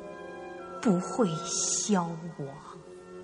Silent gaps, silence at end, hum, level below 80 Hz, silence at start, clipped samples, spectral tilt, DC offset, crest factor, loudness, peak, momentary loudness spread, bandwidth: none; 0 s; none; -68 dBFS; 0 s; under 0.1%; -4 dB/octave; under 0.1%; 18 dB; -29 LUFS; -14 dBFS; 19 LU; 10.5 kHz